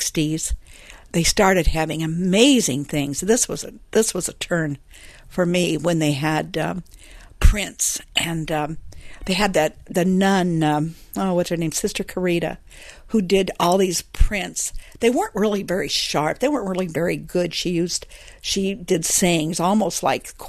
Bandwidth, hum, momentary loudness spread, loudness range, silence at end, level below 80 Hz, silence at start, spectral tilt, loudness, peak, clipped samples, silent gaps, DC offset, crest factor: 13.5 kHz; none; 9 LU; 4 LU; 0 s; -30 dBFS; 0 s; -4 dB/octave; -21 LUFS; -2 dBFS; under 0.1%; none; under 0.1%; 20 dB